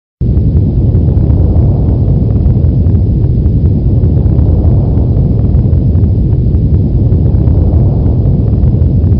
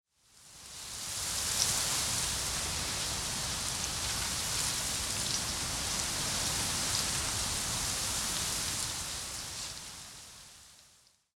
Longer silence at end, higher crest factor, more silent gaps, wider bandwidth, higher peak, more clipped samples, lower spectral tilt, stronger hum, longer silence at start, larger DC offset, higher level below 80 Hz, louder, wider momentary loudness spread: second, 0 s vs 0.5 s; second, 8 dB vs 24 dB; neither; second, 1.8 kHz vs 17.5 kHz; first, 0 dBFS vs -10 dBFS; neither; first, -15 dB/octave vs -1 dB/octave; neither; second, 0.2 s vs 0.35 s; first, 0.6% vs under 0.1%; first, -12 dBFS vs -50 dBFS; first, -10 LUFS vs -31 LUFS; second, 1 LU vs 13 LU